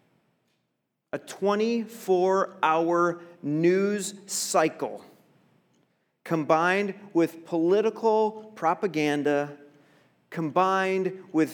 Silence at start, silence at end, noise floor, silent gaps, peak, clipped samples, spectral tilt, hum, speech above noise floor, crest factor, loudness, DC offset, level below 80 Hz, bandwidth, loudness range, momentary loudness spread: 1.15 s; 0 s; -79 dBFS; none; -8 dBFS; under 0.1%; -5 dB/octave; none; 53 dB; 18 dB; -26 LUFS; under 0.1%; -86 dBFS; 20 kHz; 3 LU; 12 LU